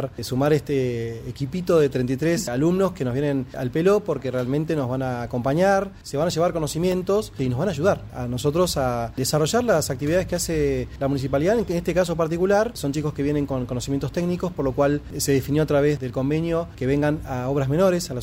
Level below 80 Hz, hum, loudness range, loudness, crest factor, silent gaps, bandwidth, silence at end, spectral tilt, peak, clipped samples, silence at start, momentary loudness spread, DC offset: -42 dBFS; none; 1 LU; -23 LUFS; 16 dB; none; 16 kHz; 0 s; -6 dB/octave; -8 dBFS; under 0.1%; 0 s; 6 LU; under 0.1%